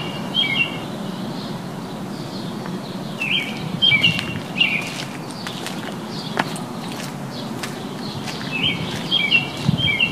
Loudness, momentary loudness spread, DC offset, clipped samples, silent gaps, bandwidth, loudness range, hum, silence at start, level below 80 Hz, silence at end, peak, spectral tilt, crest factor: -21 LUFS; 14 LU; 0.2%; under 0.1%; none; 15.5 kHz; 8 LU; none; 0 s; -52 dBFS; 0 s; 0 dBFS; -4 dB/octave; 22 dB